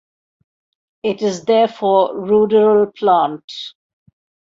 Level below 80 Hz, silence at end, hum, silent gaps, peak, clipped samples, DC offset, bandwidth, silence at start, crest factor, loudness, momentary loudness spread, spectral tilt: -62 dBFS; 0.85 s; none; 3.44-3.48 s; -2 dBFS; under 0.1%; under 0.1%; 7.6 kHz; 1.05 s; 14 dB; -15 LUFS; 16 LU; -5.5 dB/octave